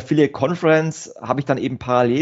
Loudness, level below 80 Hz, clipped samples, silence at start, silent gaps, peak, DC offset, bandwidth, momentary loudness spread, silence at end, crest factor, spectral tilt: -19 LUFS; -56 dBFS; under 0.1%; 0 s; none; -2 dBFS; under 0.1%; 8 kHz; 8 LU; 0 s; 16 dB; -6.5 dB/octave